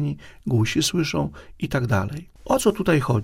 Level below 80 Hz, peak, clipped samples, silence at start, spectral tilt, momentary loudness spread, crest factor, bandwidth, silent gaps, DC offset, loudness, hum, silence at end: -44 dBFS; -4 dBFS; under 0.1%; 0 s; -5.5 dB/octave; 12 LU; 18 dB; 16 kHz; none; under 0.1%; -23 LUFS; none; 0 s